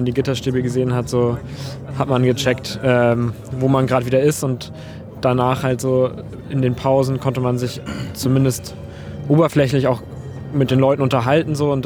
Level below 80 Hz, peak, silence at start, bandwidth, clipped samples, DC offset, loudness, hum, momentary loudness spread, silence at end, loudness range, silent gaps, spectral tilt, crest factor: -46 dBFS; -2 dBFS; 0 s; 18 kHz; under 0.1%; under 0.1%; -18 LUFS; none; 14 LU; 0 s; 2 LU; none; -6.5 dB/octave; 16 dB